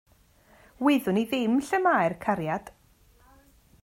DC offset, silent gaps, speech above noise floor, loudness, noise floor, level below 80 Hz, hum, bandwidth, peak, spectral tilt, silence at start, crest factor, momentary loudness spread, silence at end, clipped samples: under 0.1%; none; 35 dB; -26 LUFS; -60 dBFS; -62 dBFS; none; 16 kHz; -10 dBFS; -6 dB/octave; 0.8 s; 18 dB; 6 LU; 1.15 s; under 0.1%